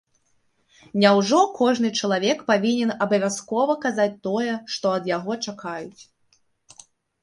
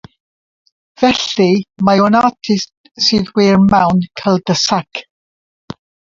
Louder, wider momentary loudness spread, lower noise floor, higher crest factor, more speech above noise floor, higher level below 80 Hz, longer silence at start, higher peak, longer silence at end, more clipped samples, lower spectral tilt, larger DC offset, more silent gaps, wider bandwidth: second, -22 LUFS vs -13 LUFS; second, 12 LU vs 17 LU; second, -66 dBFS vs under -90 dBFS; first, 20 dB vs 14 dB; second, 44 dB vs over 77 dB; second, -70 dBFS vs -46 dBFS; about the same, 0.95 s vs 1 s; second, -4 dBFS vs 0 dBFS; first, 1.2 s vs 0.4 s; neither; about the same, -4.5 dB/octave vs -5 dB/octave; neither; second, none vs 2.77-2.84 s, 5.10-5.68 s; first, 11.5 kHz vs 7.6 kHz